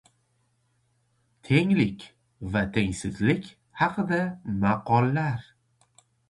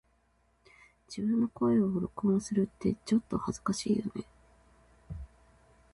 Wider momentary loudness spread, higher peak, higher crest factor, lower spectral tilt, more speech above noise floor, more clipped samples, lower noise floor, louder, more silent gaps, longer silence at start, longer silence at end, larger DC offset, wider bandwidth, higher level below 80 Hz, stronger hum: second, 8 LU vs 19 LU; first, -6 dBFS vs -16 dBFS; first, 22 dB vs 16 dB; about the same, -7 dB/octave vs -6.5 dB/octave; first, 45 dB vs 40 dB; neither; about the same, -70 dBFS vs -70 dBFS; first, -26 LUFS vs -31 LUFS; neither; first, 1.45 s vs 1.1 s; first, 0.9 s vs 0.7 s; neither; about the same, 11.5 kHz vs 11.5 kHz; about the same, -52 dBFS vs -56 dBFS; neither